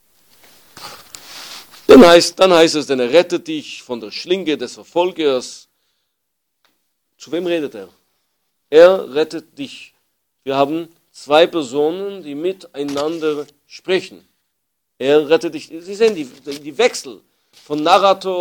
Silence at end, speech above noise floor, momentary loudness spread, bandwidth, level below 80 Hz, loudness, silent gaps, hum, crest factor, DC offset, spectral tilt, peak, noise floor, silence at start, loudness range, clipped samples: 0 s; 59 dB; 23 LU; 20 kHz; -54 dBFS; -15 LUFS; none; none; 16 dB; under 0.1%; -4 dB/octave; 0 dBFS; -74 dBFS; 0.8 s; 11 LU; 0.5%